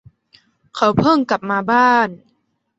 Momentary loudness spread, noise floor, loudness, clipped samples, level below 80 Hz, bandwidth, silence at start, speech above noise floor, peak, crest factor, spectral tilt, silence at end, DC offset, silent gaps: 8 LU; -66 dBFS; -16 LUFS; under 0.1%; -52 dBFS; 8.2 kHz; 0.75 s; 51 dB; -2 dBFS; 16 dB; -6 dB/octave; 0.6 s; under 0.1%; none